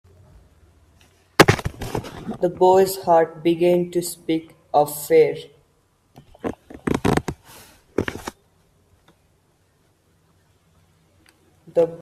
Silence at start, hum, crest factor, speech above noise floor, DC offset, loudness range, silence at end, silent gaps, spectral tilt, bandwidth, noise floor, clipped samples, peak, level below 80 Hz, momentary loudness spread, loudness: 1.4 s; none; 22 dB; 44 dB; under 0.1%; 16 LU; 0 s; none; -5 dB/octave; 16 kHz; -62 dBFS; under 0.1%; 0 dBFS; -46 dBFS; 16 LU; -20 LUFS